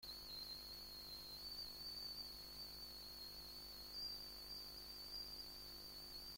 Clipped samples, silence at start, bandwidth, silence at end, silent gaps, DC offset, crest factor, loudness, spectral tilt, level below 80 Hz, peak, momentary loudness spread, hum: under 0.1%; 0 s; 16.5 kHz; 0 s; none; under 0.1%; 16 dB; -51 LUFS; -2 dB/octave; -68 dBFS; -38 dBFS; 4 LU; 50 Hz at -65 dBFS